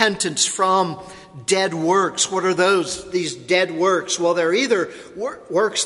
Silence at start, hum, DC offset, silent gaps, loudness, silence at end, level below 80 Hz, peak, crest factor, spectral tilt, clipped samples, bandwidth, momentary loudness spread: 0 s; none; under 0.1%; none; -19 LUFS; 0 s; -60 dBFS; 0 dBFS; 20 dB; -2.5 dB/octave; under 0.1%; 11.5 kHz; 12 LU